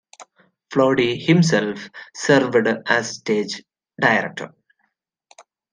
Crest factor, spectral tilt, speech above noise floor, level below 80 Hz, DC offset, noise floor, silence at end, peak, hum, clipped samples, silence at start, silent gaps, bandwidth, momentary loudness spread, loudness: 18 dB; -5 dB/octave; 53 dB; -64 dBFS; under 0.1%; -72 dBFS; 0.3 s; -2 dBFS; none; under 0.1%; 0.2 s; none; 10 kHz; 17 LU; -19 LUFS